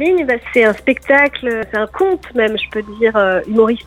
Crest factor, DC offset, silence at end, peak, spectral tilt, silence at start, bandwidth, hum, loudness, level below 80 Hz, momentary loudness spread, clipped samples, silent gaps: 14 dB; under 0.1%; 0.05 s; 0 dBFS; -5.5 dB/octave; 0 s; 13.5 kHz; none; -15 LUFS; -44 dBFS; 8 LU; under 0.1%; none